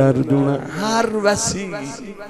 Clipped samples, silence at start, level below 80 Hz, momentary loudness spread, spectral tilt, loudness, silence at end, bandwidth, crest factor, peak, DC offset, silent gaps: under 0.1%; 0 s; -48 dBFS; 11 LU; -5 dB/octave; -19 LUFS; 0 s; 13 kHz; 16 dB; -2 dBFS; under 0.1%; none